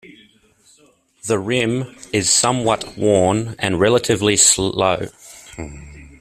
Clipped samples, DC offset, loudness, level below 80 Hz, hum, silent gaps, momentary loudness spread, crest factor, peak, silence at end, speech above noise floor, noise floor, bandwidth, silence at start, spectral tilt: under 0.1%; under 0.1%; -16 LUFS; -48 dBFS; none; none; 21 LU; 20 dB; 0 dBFS; 0.15 s; 37 dB; -55 dBFS; 15.5 kHz; 0.05 s; -3 dB/octave